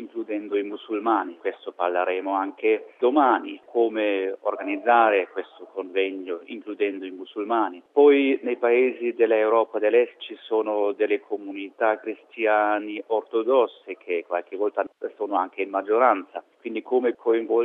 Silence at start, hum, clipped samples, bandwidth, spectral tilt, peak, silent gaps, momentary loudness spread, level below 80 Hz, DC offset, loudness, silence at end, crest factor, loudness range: 0 s; none; under 0.1%; 3.9 kHz; -6.5 dB/octave; -6 dBFS; none; 13 LU; -82 dBFS; under 0.1%; -24 LUFS; 0 s; 18 dB; 4 LU